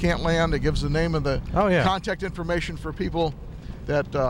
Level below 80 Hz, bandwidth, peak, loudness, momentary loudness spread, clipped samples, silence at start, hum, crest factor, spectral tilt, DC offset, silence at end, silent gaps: -34 dBFS; 16.5 kHz; -8 dBFS; -25 LUFS; 9 LU; under 0.1%; 0 s; none; 16 dB; -6.5 dB/octave; under 0.1%; 0 s; none